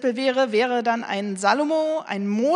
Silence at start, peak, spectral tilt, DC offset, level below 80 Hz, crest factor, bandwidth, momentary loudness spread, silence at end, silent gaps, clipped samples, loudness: 0 s; -6 dBFS; -4.5 dB/octave; under 0.1%; -76 dBFS; 16 dB; 10.5 kHz; 5 LU; 0 s; none; under 0.1%; -22 LUFS